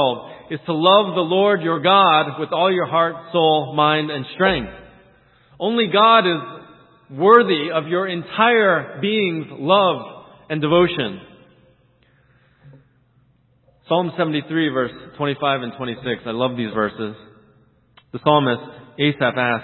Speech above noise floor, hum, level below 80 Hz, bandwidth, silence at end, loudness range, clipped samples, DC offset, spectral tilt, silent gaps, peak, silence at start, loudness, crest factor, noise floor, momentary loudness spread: 40 dB; none; -54 dBFS; 4.3 kHz; 0 s; 8 LU; under 0.1%; under 0.1%; -9.5 dB/octave; none; 0 dBFS; 0 s; -18 LUFS; 20 dB; -58 dBFS; 14 LU